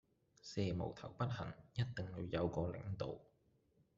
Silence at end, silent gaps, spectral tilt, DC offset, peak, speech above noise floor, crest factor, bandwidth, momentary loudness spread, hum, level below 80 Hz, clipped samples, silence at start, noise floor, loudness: 0.75 s; none; -6.5 dB/octave; under 0.1%; -24 dBFS; 34 dB; 20 dB; 7.6 kHz; 7 LU; none; -66 dBFS; under 0.1%; 0.45 s; -76 dBFS; -44 LUFS